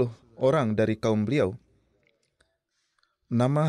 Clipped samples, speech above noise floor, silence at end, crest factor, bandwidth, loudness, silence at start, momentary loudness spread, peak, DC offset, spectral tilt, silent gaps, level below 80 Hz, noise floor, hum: under 0.1%; 52 dB; 0 s; 16 dB; 11 kHz; -26 LUFS; 0 s; 7 LU; -12 dBFS; under 0.1%; -8 dB/octave; none; -62 dBFS; -76 dBFS; none